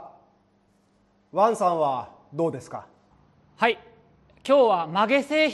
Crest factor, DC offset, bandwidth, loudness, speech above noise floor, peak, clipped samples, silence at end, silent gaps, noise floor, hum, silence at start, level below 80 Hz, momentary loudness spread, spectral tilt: 20 dB; under 0.1%; 12 kHz; -23 LUFS; 42 dB; -6 dBFS; under 0.1%; 0 s; none; -64 dBFS; none; 0 s; -70 dBFS; 18 LU; -5 dB/octave